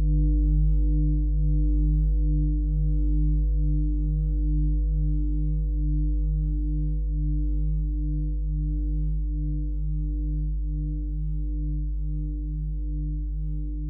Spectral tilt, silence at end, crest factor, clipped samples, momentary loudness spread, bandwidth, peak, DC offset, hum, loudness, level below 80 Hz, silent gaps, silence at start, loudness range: -16.5 dB/octave; 0 s; 10 dB; under 0.1%; 7 LU; 0.7 kHz; -14 dBFS; under 0.1%; none; -28 LUFS; -24 dBFS; none; 0 s; 5 LU